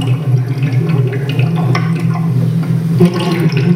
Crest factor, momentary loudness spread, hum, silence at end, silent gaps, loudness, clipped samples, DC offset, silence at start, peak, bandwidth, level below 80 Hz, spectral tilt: 12 dB; 3 LU; none; 0 s; none; -14 LUFS; under 0.1%; under 0.1%; 0 s; 0 dBFS; 14.5 kHz; -50 dBFS; -8 dB/octave